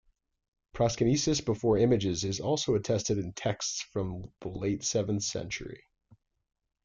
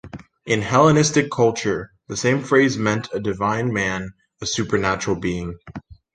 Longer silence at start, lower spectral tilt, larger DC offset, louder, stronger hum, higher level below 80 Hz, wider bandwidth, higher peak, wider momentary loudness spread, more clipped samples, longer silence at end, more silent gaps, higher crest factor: first, 0.75 s vs 0.05 s; about the same, -5 dB/octave vs -5 dB/octave; neither; second, -30 LUFS vs -20 LUFS; neither; second, -54 dBFS vs -48 dBFS; about the same, 9.6 kHz vs 10 kHz; second, -14 dBFS vs -2 dBFS; second, 12 LU vs 18 LU; neither; first, 1.1 s vs 0.2 s; neither; about the same, 16 dB vs 18 dB